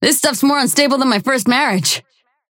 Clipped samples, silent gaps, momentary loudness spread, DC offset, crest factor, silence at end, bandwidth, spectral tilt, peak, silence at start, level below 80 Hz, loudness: under 0.1%; none; 3 LU; under 0.1%; 14 dB; 0.5 s; 17 kHz; -2.5 dB/octave; 0 dBFS; 0 s; -64 dBFS; -14 LUFS